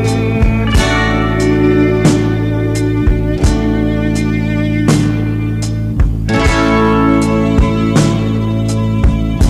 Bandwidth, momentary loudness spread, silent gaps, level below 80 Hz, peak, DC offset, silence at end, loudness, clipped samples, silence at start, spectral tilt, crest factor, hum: 13 kHz; 4 LU; none; -20 dBFS; 0 dBFS; under 0.1%; 0 s; -13 LUFS; under 0.1%; 0 s; -6.5 dB/octave; 12 dB; none